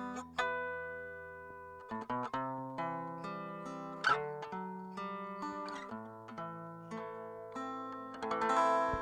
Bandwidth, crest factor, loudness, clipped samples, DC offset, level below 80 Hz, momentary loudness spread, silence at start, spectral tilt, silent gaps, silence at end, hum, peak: 14 kHz; 22 dB; -39 LUFS; under 0.1%; under 0.1%; -66 dBFS; 14 LU; 0 s; -5 dB/octave; none; 0 s; none; -18 dBFS